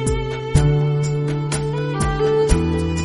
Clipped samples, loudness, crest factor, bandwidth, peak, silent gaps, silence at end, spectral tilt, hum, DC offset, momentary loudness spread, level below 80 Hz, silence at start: under 0.1%; -19 LUFS; 16 dB; 11.5 kHz; -2 dBFS; none; 0 s; -6.5 dB/octave; none; under 0.1%; 5 LU; -28 dBFS; 0 s